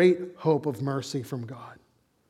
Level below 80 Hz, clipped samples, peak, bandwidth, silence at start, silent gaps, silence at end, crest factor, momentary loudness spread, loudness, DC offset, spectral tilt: -74 dBFS; under 0.1%; -8 dBFS; 13.5 kHz; 0 s; none; 0.55 s; 20 dB; 17 LU; -28 LUFS; under 0.1%; -7 dB/octave